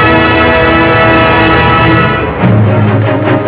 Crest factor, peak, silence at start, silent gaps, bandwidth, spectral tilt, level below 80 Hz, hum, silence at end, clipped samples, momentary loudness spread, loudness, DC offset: 6 dB; 0 dBFS; 0 s; none; 4 kHz; -10 dB/octave; -24 dBFS; none; 0 s; 2%; 4 LU; -7 LUFS; under 0.1%